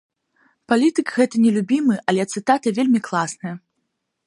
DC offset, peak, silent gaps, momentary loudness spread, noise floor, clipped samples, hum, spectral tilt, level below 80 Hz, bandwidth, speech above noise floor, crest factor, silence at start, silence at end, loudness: under 0.1%; -2 dBFS; none; 9 LU; -75 dBFS; under 0.1%; none; -5.5 dB/octave; -70 dBFS; 11.5 kHz; 56 dB; 18 dB; 0.7 s; 0.7 s; -19 LUFS